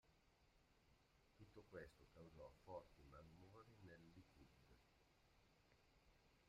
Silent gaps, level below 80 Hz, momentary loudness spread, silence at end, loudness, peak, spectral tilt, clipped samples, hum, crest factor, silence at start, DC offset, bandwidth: none; -78 dBFS; 8 LU; 0 s; -65 LUFS; -44 dBFS; -6 dB/octave; under 0.1%; none; 22 dB; 0.05 s; under 0.1%; 9 kHz